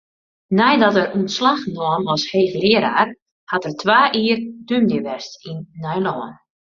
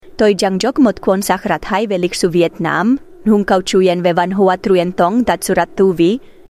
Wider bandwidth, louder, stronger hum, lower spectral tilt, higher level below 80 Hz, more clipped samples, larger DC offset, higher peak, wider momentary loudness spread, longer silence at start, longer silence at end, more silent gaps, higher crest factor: second, 7.4 kHz vs 15 kHz; second, -18 LUFS vs -14 LUFS; neither; about the same, -5 dB/octave vs -5.5 dB/octave; second, -60 dBFS vs -44 dBFS; neither; neither; about the same, 0 dBFS vs -2 dBFS; first, 15 LU vs 4 LU; first, 0.5 s vs 0.05 s; first, 0.35 s vs 0.2 s; first, 3.22-3.47 s vs none; first, 18 dB vs 12 dB